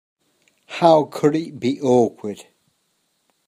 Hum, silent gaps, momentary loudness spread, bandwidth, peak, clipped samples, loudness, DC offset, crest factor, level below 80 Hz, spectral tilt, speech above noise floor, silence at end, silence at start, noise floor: none; none; 17 LU; 15 kHz; 0 dBFS; under 0.1%; -18 LUFS; under 0.1%; 20 dB; -68 dBFS; -6.5 dB/octave; 51 dB; 1.05 s; 0.7 s; -69 dBFS